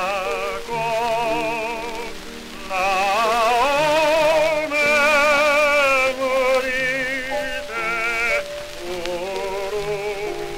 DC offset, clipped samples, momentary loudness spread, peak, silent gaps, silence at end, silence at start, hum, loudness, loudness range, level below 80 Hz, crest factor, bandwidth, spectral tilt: under 0.1%; under 0.1%; 12 LU; -4 dBFS; none; 0 s; 0 s; none; -19 LUFS; 7 LU; -44 dBFS; 16 dB; 16 kHz; -2.5 dB/octave